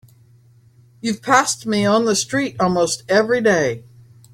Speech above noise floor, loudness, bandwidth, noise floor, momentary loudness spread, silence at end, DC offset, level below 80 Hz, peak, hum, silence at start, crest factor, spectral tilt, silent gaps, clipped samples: 33 dB; -18 LUFS; 16 kHz; -51 dBFS; 9 LU; 0.55 s; under 0.1%; -56 dBFS; -2 dBFS; none; 1.05 s; 18 dB; -3.5 dB/octave; none; under 0.1%